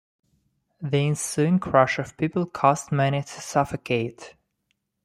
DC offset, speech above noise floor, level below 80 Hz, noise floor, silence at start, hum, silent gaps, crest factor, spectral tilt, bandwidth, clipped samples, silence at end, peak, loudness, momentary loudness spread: under 0.1%; 52 dB; -58 dBFS; -75 dBFS; 0.8 s; none; none; 22 dB; -5.5 dB/octave; 14.5 kHz; under 0.1%; 0.75 s; -4 dBFS; -24 LUFS; 7 LU